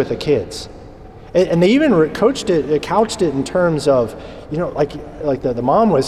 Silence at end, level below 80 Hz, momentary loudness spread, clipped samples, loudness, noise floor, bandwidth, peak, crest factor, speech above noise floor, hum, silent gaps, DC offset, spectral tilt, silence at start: 0 s; -42 dBFS; 11 LU; under 0.1%; -17 LUFS; -37 dBFS; 13.5 kHz; -4 dBFS; 14 dB; 21 dB; none; none; under 0.1%; -6 dB/octave; 0 s